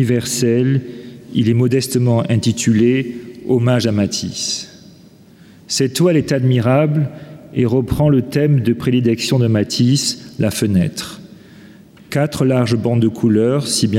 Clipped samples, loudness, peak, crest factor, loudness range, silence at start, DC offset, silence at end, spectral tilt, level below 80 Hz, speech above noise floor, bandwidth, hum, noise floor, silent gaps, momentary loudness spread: under 0.1%; -16 LUFS; -4 dBFS; 12 dB; 3 LU; 0 s; under 0.1%; 0 s; -5.5 dB/octave; -46 dBFS; 29 dB; 16 kHz; none; -44 dBFS; none; 9 LU